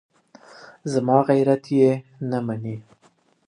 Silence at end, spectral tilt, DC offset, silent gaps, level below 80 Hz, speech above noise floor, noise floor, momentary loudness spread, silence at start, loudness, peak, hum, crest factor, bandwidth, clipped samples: 0.65 s; -8 dB/octave; under 0.1%; none; -68 dBFS; 40 dB; -60 dBFS; 15 LU; 0.6 s; -21 LUFS; -2 dBFS; none; 20 dB; 11 kHz; under 0.1%